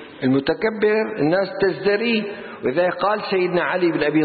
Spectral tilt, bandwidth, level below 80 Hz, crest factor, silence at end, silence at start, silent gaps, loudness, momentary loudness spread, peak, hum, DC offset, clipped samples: -11 dB/octave; 4.8 kHz; -58 dBFS; 14 dB; 0 s; 0 s; none; -20 LUFS; 3 LU; -6 dBFS; none; under 0.1%; under 0.1%